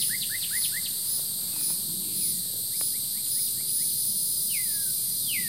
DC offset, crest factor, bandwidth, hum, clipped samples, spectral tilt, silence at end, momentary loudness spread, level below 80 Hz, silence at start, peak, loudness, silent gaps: 0.2%; 16 dB; 16 kHz; none; under 0.1%; 1 dB/octave; 0 s; 3 LU; -64 dBFS; 0 s; -14 dBFS; -25 LUFS; none